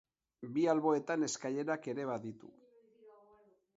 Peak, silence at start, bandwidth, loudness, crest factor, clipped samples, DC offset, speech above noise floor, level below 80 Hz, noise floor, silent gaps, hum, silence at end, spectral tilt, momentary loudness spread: -18 dBFS; 0.4 s; 7.6 kHz; -35 LUFS; 20 dB; under 0.1%; under 0.1%; 32 dB; -84 dBFS; -67 dBFS; none; none; 0.65 s; -5 dB/octave; 16 LU